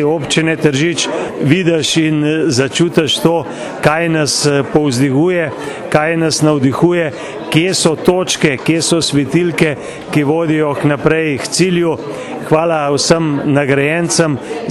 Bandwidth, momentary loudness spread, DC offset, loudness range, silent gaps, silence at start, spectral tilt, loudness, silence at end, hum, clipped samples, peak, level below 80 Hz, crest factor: 13 kHz; 5 LU; under 0.1%; 1 LU; none; 0 s; -4.5 dB/octave; -13 LUFS; 0 s; none; under 0.1%; 0 dBFS; -46 dBFS; 14 dB